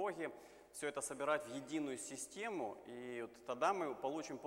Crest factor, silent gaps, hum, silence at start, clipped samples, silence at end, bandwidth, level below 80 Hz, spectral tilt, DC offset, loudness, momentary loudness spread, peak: 22 dB; none; none; 0 s; under 0.1%; 0 s; 16.5 kHz; -80 dBFS; -3.5 dB/octave; under 0.1%; -43 LUFS; 10 LU; -22 dBFS